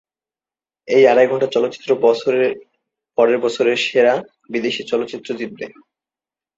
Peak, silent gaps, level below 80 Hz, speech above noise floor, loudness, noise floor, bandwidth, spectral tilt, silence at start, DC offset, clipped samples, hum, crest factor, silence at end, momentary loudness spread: -2 dBFS; none; -68 dBFS; over 74 dB; -17 LUFS; under -90 dBFS; 7.8 kHz; -4.5 dB/octave; 0.9 s; under 0.1%; under 0.1%; none; 16 dB; 0.9 s; 14 LU